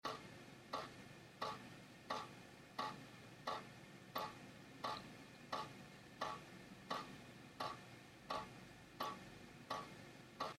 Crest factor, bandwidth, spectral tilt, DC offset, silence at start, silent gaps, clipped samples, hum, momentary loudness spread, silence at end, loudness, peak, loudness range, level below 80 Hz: 22 dB; 16 kHz; -4 dB/octave; under 0.1%; 0.05 s; none; under 0.1%; none; 10 LU; 0 s; -51 LUFS; -30 dBFS; 1 LU; -78 dBFS